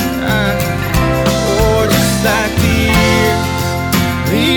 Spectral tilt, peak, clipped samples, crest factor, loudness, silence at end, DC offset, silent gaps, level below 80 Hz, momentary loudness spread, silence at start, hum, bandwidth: -5 dB/octave; 0 dBFS; under 0.1%; 12 dB; -13 LUFS; 0 s; under 0.1%; none; -24 dBFS; 4 LU; 0 s; none; over 20 kHz